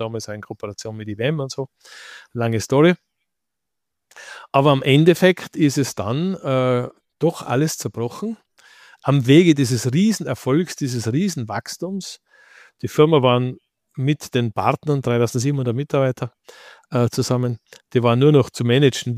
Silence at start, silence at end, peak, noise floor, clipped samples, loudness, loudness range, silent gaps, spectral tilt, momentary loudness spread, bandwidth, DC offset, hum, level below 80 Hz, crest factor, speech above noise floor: 0 s; 0 s; -2 dBFS; -83 dBFS; under 0.1%; -19 LUFS; 4 LU; none; -6 dB/octave; 16 LU; 15.5 kHz; under 0.1%; none; -60 dBFS; 18 dB; 65 dB